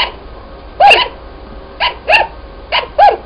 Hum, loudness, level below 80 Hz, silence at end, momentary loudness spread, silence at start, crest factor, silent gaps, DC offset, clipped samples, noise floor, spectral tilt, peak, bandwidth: none; -11 LUFS; -34 dBFS; 0 s; 12 LU; 0 s; 14 dB; none; under 0.1%; 0.4%; -31 dBFS; -3 dB/octave; 0 dBFS; 11 kHz